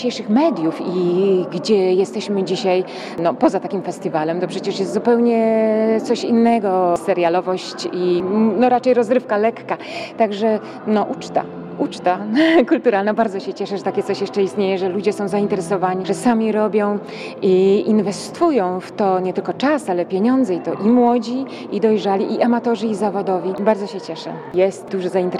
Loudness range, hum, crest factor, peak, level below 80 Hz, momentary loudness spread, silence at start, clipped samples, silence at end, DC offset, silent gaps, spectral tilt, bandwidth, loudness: 3 LU; none; 16 dB; -2 dBFS; -64 dBFS; 9 LU; 0 s; under 0.1%; 0 s; under 0.1%; none; -6 dB/octave; 12 kHz; -18 LUFS